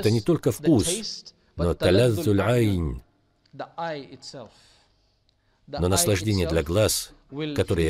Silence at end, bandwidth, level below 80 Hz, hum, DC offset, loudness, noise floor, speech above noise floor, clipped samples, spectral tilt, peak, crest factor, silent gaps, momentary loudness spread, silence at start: 0 s; 16 kHz; -42 dBFS; none; under 0.1%; -23 LUFS; -66 dBFS; 43 dB; under 0.1%; -5 dB/octave; -6 dBFS; 18 dB; none; 19 LU; 0 s